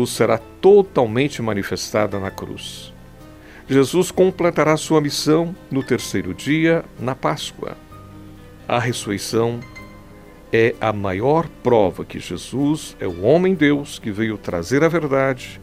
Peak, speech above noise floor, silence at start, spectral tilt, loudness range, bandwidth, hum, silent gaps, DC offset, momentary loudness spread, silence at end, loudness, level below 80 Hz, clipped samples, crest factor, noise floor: -2 dBFS; 23 dB; 0 s; -5.5 dB/octave; 4 LU; 16 kHz; none; none; 0.1%; 14 LU; 0 s; -19 LUFS; -48 dBFS; under 0.1%; 18 dB; -42 dBFS